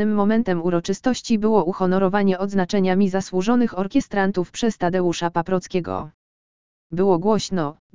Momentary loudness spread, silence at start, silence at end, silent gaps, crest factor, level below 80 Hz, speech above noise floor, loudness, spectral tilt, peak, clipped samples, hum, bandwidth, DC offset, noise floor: 6 LU; 0 s; 0 s; 6.14-6.90 s, 7.79-7.90 s; 16 dB; -50 dBFS; over 70 dB; -21 LUFS; -6 dB/octave; -4 dBFS; under 0.1%; none; 7.6 kHz; 2%; under -90 dBFS